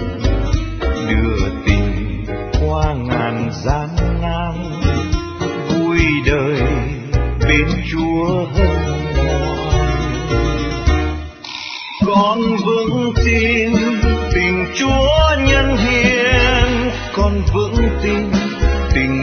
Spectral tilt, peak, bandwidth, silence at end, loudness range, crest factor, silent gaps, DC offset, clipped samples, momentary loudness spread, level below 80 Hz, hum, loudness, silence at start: -6 dB/octave; 0 dBFS; 6.6 kHz; 0 s; 5 LU; 16 dB; none; under 0.1%; under 0.1%; 8 LU; -20 dBFS; none; -16 LUFS; 0 s